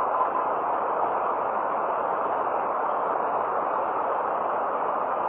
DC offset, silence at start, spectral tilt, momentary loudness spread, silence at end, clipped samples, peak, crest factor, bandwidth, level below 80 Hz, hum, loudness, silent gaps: under 0.1%; 0 s; -3.5 dB/octave; 1 LU; 0 s; under 0.1%; -12 dBFS; 14 dB; 4 kHz; -66 dBFS; none; -26 LUFS; none